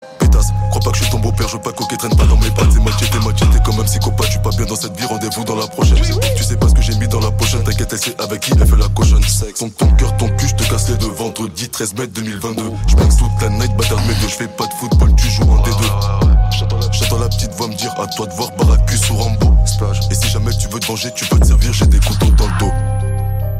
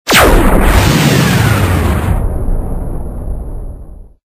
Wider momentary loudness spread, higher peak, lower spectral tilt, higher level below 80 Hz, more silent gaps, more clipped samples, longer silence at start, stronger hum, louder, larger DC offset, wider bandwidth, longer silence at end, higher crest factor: second, 8 LU vs 16 LU; about the same, -2 dBFS vs 0 dBFS; about the same, -5 dB/octave vs -5 dB/octave; about the same, -16 dBFS vs -16 dBFS; neither; second, under 0.1% vs 0.2%; about the same, 0 s vs 0.05 s; neither; second, -15 LUFS vs -11 LUFS; neither; about the same, 16 kHz vs 16 kHz; second, 0 s vs 0.35 s; about the same, 10 dB vs 10 dB